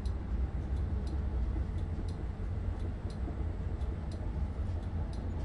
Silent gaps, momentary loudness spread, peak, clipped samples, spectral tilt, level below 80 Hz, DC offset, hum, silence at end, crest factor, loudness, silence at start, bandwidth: none; 3 LU; -24 dBFS; under 0.1%; -8.5 dB/octave; -38 dBFS; under 0.1%; none; 0 s; 12 dB; -38 LUFS; 0 s; 10.5 kHz